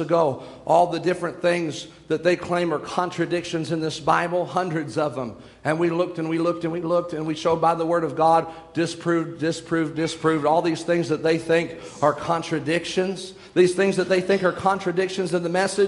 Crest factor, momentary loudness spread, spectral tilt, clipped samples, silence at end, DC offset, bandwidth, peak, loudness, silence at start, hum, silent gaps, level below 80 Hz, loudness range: 18 dB; 7 LU; -5.5 dB/octave; under 0.1%; 0 s; under 0.1%; 11.5 kHz; -4 dBFS; -23 LUFS; 0 s; none; none; -60 dBFS; 2 LU